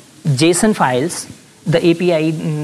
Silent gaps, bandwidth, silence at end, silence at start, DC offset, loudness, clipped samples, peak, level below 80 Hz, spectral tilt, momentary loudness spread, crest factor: none; 13.5 kHz; 0 s; 0.25 s; under 0.1%; -15 LUFS; under 0.1%; -2 dBFS; -48 dBFS; -5 dB/octave; 13 LU; 14 dB